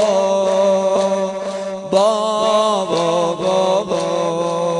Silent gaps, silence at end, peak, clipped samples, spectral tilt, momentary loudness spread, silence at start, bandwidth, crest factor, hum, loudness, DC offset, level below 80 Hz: none; 0 s; -2 dBFS; under 0.1%; -4.5 dB/octave; 5 LU; 0 s; 11 kHz; 14 dB; none; -17 LUFS; under 0.1%; -60 dBFS